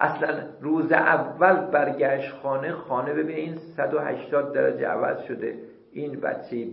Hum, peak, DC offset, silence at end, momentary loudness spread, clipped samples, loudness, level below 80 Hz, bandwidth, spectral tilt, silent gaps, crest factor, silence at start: none; -2 dBFS; under 0.1%; 0 s; 12 LU; under 0.1%; -25 LUFS; -74 dBFS; 5.6 kHz; -11 dB/octave; none; 22 dB; 0 s